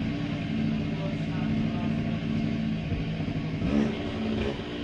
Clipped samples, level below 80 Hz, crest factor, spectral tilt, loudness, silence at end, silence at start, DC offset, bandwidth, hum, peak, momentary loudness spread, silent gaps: under 0.1%; -44 dBFS; 14 dB; -8 dB/octave; -29 LUFS; 0 s; 0 s; under 0.1%; 7.8 kHz; none; -14 dBFS; 4 LU; none